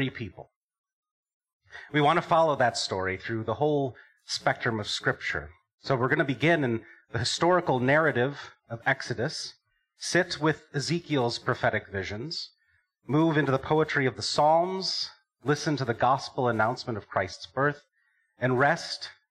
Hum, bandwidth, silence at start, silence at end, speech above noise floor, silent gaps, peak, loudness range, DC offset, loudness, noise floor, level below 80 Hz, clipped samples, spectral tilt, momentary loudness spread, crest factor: none; 12 kHz; 0 s; 0.2 s; 44 dB; 0.56-0.69 s, 0.78-0.84 s, 0.93-1.03 s, 1.11-1.23 s, 1.33-1.40 s, 1.53-1.60 s, 5.74-5.78 s; -10 dBFS; 3 LU; under 0.1%; -27 LUFS; -71 dBFS; -62 dBFS; under 0.1%; -5 dB/octave; 12 LU; 18 dB